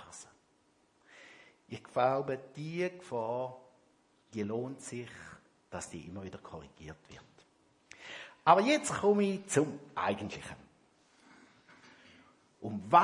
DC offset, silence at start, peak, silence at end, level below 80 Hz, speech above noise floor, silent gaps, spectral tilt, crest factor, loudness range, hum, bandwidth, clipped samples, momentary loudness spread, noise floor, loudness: under 0.1%; 0 s; -8 dBFS; 0 s; -72 dBFS; 38 dB; none; -5 dB/octave; 28 dB; 12 LU; none; 11.5 kHz; under 0.1%; 24 LU; -71 dBFS; -33 LUFS